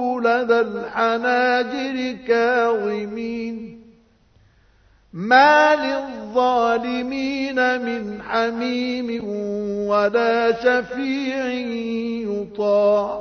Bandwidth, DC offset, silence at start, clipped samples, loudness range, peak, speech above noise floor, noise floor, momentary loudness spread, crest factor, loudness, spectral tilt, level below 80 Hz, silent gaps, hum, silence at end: 6.6 kHz; under 0.1%; 0 s; under 0.1%; 5 LU; -2 dBFS; 36 dB; -56 dBFS; 10 LU; 20 dB; -20 LUFS; -5 dB/octave; -58 dBFS; none; none; 0 s